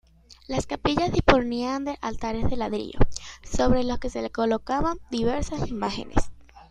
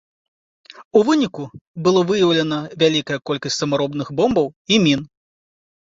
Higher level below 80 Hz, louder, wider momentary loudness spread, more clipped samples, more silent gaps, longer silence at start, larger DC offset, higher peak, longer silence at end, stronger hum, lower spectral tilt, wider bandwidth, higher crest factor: first, -34 dBFS vs -56 dBFS; second, -26 LUFS vs -18 LUFS; about the same, 9 LU vs 8 LU; neither; second, none vs 0.85-0.91 s, 1.61-1.74 s, 4.56-4.65 s; second, 0.3 s vs 0.8 s; neither; about the same, 0 dBFS vs -2 dBFS; second, 0.1 s vs 0.8 s; neither; about the same, -5.5 dB/octave vs -5 dB/octave; first, 9.4 kHz vs 7.8 kHz; first, 24 dB vs 18 dB